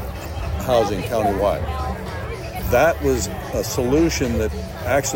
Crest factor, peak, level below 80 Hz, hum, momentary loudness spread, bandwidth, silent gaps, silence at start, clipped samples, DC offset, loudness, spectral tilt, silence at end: 14 dB; -6 dBFS; -30 dBFS; none; 11 LU; 16.5 kHz; none; 0 s; under 0.1%; under 0.1%; -21 LUFS; -5 dB/octave; 0 s